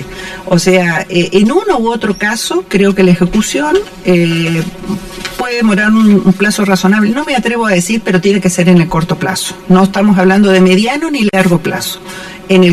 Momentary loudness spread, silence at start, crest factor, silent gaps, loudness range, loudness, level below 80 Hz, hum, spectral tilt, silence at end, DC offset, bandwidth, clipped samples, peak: 10 LU; 0 s; 10 dB; none; 2 LU; -10 LUFS; -38 dBFS; none; -5.5 dB/octave; 0 s; under 0.1%; 14 kHz; under 0.1%; 0 dBFS